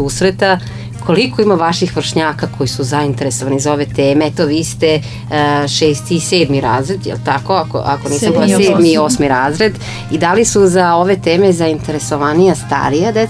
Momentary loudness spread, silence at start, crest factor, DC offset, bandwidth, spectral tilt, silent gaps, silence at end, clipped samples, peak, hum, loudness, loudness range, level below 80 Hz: 7 LU; 0 s; 12 dB; under 0.1%; 11 kHz; -5 dB/octave; none; 0 s; under 0.1%; 0 dBFS; none; -13 LUFS; 3 LU; -38 dBFS